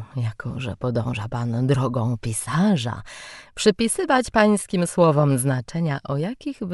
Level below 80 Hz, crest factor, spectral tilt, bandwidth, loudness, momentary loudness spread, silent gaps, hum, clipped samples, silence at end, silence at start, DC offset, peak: -50 dBFS; 18 dB; -5.5 dB/octave; 11.5 kHz; -22 LUFS; 12 LU; none; none; under 0.1%; 0 s; 0 s; under 0.1%; -4 dBFS